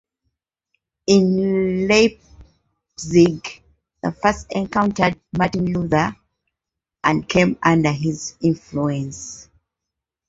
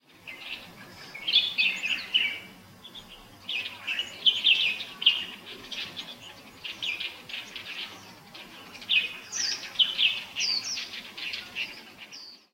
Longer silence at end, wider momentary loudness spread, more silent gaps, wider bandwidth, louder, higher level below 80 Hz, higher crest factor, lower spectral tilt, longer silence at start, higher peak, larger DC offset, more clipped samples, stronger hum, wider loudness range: first, 0.85 s vs 0.2 s; second, 14 LU vs 23 LU; neither; second, 8 kHz vs 16 kHz; first, -19 LUFS vs -26 LUFS; first, -48 dBFS vs -68 dBFS; about the same, 20 dB vs 22 dB; first, -5.5 dB/octave vs 1 dB/octave; first, 1.1 s vs 0.15 s; first, -2 dBFS vs -8 dBFS; neither; neither; neither; second, 3 LU vs 6 LU